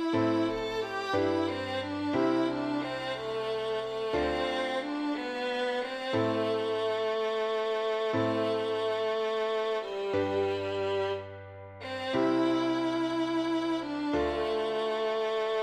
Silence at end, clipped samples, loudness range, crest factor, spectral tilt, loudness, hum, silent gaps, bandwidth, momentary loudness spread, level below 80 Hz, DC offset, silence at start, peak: 0 s; under 0.1%; 2 LU; 14 dB; -5.5 dB/octave; -30 LUFS; none; none; 9.8 kHz; 5 LU; -58 dBFS; under 0.1%; 0 s; -16 dBFS